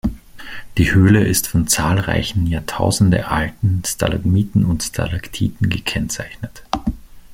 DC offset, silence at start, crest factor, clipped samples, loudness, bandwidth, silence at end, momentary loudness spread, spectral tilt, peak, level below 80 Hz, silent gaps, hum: under 0.1%; 0.05 s; 16 dB; under 0.1%; -18 LUFS; 16.5 kHz; 0 s; 12 LU; -5 dB/octave; -2 dBFS; -34 dBFS; none; none